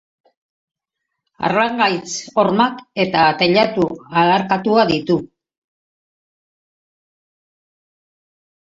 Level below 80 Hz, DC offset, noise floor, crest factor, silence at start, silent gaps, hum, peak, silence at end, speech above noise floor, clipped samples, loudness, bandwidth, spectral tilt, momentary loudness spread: -58 dBFS; under 0.1%; -79 dBFS; 18 dB; 1.4 s; none; none; -2 dBFS; 3.5 s; 63 dB; under 0.1%; -17 LUFS; 8 kHz; -5 dB/octave; 7 LU